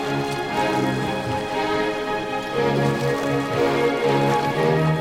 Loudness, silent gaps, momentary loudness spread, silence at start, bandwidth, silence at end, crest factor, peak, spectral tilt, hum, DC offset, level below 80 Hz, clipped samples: -22 LUFS; none; 5 LU; 0 s; 16.5 kHz; 0 s; 14 dB; -8 dBFS; -6 dB/octave; none; under 0.1%; -50 dBFS; under 0.1%